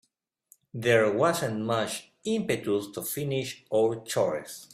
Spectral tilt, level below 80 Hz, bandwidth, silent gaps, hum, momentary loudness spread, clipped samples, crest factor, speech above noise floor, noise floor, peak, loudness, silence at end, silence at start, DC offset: -4.5 dB/octave; -68 dBFS; 16 kHz; none; none; 10 LU; under 0.1%; 18 dB; 36 dB; -63 dBFS; -10 dBFS; -28 LUFS; 0.1 s; 0.75 s; under 0.1%